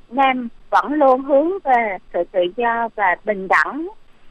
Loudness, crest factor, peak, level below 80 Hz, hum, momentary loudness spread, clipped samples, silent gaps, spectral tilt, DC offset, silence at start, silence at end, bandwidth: -18 LUFS; 14 dB; -4 dBFS; -50 dBFS; none; 8 LU; under 0.1%; none; -5.5 dB/octave; under 0.1%; 0.1 s; 0 s; 8.8 kHz